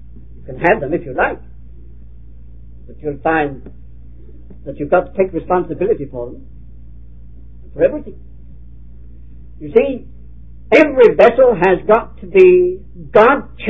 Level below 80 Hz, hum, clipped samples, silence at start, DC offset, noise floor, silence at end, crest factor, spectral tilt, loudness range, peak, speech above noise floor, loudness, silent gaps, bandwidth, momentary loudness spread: -38 dBFS; none; 0.1%; 0.15 s; 2%; -38 dBFS; 0 s; 16 dB; -8 dB/octave; 13 LU; 0 dBFS; 24 dB; -14 LUFS; none; 7.8 kHz; 21 LU